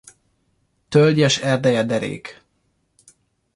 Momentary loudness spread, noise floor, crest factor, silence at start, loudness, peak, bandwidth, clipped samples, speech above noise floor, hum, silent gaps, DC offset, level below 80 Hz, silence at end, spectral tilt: 16 LU; -67 dBFS; 18 dB; 0.9 s; -18 LUFS; -4 dBFS; 11.5 kHz; under 0.1%; 50 dB; none; none; under 0.1%; -58 dBFS; 1.25 s; -5 dB/octave